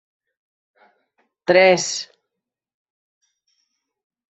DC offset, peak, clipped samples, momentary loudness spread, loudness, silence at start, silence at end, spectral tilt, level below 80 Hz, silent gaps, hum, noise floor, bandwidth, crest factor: under 0.1%; -2 dBFS; under 0.1%; 17 LU; -17 LUFS; 1.5 s; 2.3 s; -3 dB/octave; -72 dBFS; none; none; -83 dBFS; 8.2 kHz; 22 dB